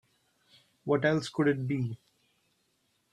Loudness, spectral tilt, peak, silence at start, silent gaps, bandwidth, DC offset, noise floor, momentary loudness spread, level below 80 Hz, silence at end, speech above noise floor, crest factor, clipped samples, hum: -30 LUFS; -7 dB/octave; -14 dBFS; 0.85 s; none; 11.5 kHz; under 0.1%; -74 dBFS; 14 LU; -70 dBFS; 1.2 s; 46 dB; 20 dB; under 0.1%; none